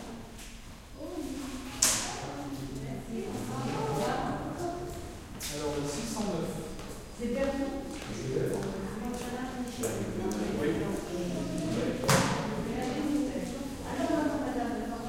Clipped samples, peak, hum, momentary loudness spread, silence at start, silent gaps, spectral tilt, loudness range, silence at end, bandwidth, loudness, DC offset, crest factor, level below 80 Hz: under 0.1%; -6 dBFS; none; 12 LU; 0 s; none; -4 dB/octave; 4 LU; 0 s; 16.5 kHz; -33 LUFS; under 0.1%; 28 dB; -48 dBFS